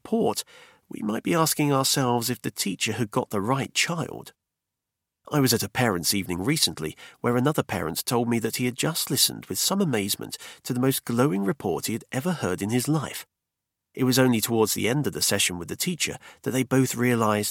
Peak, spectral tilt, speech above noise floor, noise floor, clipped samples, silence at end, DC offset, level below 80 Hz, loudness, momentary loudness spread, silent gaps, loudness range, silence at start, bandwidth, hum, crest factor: -6 dBFS; -4 dB/octave; 60 dB; -85 dBFS; under 0.1%; 0 s; under 0.1%; -60 dBFS; -25 LUFS; 9 LU; none; 3 LU; 0.05 s; 17.5 kHz; none; 20 dB